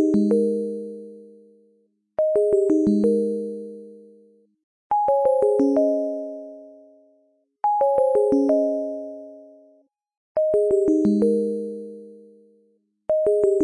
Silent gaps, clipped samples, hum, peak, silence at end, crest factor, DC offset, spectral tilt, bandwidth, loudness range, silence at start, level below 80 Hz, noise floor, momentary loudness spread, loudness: 4.63-4.90 s, 10.17-10.35 s; under 0.1%; none; -8 dBFS; 0 s; 14 dB; under 0.1%; -9 dB/octave; 11 kHz; 1 LU; 0 s; -60 dBFS; -65 dBFS; 19 LU; -21 LUFS